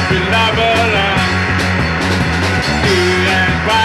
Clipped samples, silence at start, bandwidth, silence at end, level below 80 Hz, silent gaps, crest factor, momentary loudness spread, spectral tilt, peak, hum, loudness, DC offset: under 0.1%; 0 s; 15 kHz; 0 s; -30 dBFS; none; 12 dB; 3 LU; -4.5 dB/octave; -2 dBFS; none; -13 LUFS; 0.1%